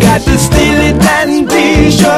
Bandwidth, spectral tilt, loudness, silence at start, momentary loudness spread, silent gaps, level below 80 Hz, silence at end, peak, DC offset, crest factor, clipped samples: 14.5 kHz; -5 dB/octave; -8 LUFS; 0 s; 2 LU; none; -18 dBFS; 0 s; 0 dBFS; under 0.1%; 8 dB; 1%